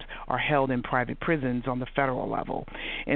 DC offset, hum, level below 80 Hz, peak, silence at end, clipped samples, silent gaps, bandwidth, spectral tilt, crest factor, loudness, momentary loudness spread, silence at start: under 0.1%; none; -44 dBFS; -8 dBFS; 0 s; under 0.1%; none; 4.4 kHz; -4.5 dB/octave; 20 dB; -28 LUFS; 8 LU; 0 s